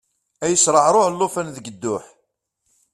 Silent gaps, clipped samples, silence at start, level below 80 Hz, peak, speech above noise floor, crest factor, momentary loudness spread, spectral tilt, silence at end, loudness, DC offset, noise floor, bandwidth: none; under 0.1%; 0.4 s; -62 dBFS; -2 dBFS; 53 dB; 20 dB; 15 LU; -3 dB/octave; 0.9 s; -18 LUFS; under 0.1%; -72 dBFS; 14 kHz